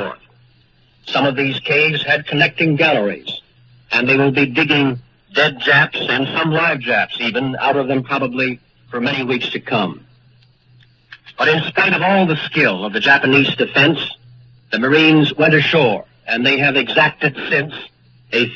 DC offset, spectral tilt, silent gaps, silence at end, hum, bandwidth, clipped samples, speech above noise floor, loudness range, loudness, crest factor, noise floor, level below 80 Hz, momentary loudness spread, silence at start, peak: under 0.1%; -6.5 dB/octave; none; 0 s; none; 7.4 kHz; under 0.1%; 38 dB; 6 LU; -15 LUFS; 16 dB; -53 dBFS; -56 dBFS; 10 LU; 0 s; 0 dBFS